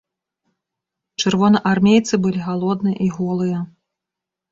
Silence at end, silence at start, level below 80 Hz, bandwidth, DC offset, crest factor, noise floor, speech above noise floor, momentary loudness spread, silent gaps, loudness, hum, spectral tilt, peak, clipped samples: 0.85 s; 1.2 s; -56 dBFS; 7.8 kHz; under 0.1%; 18 dB; -85 dBFS; 68 dB; 10 LU; none; -18 LUFS; none; -6 dB/octave; -2 dBFS; under 0.1%